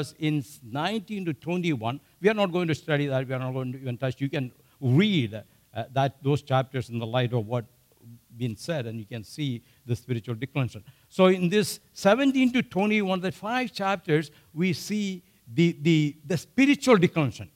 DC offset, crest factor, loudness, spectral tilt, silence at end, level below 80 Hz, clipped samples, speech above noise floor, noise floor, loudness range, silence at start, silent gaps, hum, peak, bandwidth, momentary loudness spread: under 0.1%; 20 dB; -26 LUFS; -6 dB/octave; 0.1 s; -64 dBFS; under 0.1%; 26 dB; -52 dBFS; 7 LU; 0 s; none; none; -6 dBFS; 16 kHz; 12 LU